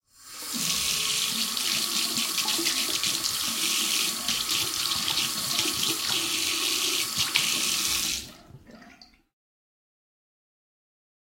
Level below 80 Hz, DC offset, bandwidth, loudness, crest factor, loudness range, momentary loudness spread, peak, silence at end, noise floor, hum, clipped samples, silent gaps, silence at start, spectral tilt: -60 dBFS; under 0.1%; 16.5 kHz; -24 LUFS; 26 dB; 5 LU; 3 LU; -4 dBFS; 2.3 s; -54 dBFS; none; under 0.1%; none; 0.2 s; 0.5 dB/octave